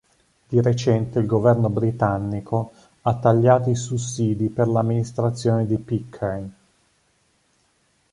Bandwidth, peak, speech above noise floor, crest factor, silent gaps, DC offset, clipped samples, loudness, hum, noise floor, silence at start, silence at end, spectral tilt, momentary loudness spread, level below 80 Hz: 11 kHz; -2 dBFS; 44 dB; 20 dB; none; under 0.1%; under 0.1%; -21 LUFS; none; -65 dBFS; 0.5 s; 1.6 s; -7.5 dB/octave; 10 LU; -50 dBFS